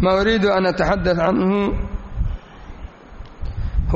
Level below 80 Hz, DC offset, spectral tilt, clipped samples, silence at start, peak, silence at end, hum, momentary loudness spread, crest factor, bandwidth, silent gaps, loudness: -28 dBFS; under 0.1%; -5 dB/octave; under 0.1%; 0 s; -6 dBFS; 0 s; none; 22 LU; 14 dB; 7.6 kHz; none; -20 LUFS